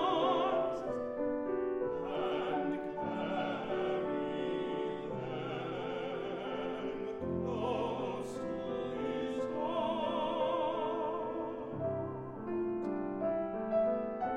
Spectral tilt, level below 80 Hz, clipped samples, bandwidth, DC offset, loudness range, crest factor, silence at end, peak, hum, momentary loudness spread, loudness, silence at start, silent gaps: -7 dB/octave; -64 dBFS; under 0.1%; 10 kHz; under 0.1%; 2 LU; 16 dB; 0 s; -20 dBFS; none; 6 LU; -36 LUFS; 0 s; none